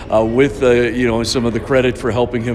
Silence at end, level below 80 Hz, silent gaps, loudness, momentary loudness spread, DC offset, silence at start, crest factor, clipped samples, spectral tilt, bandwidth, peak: 0 s; -34 dBFS; none; -15 LUFS; 4 LU; under 0.1%; 0 s; 14 dB; under 0.1%; -5.5 dB/octave; 13.5 kHz; 0 dBFS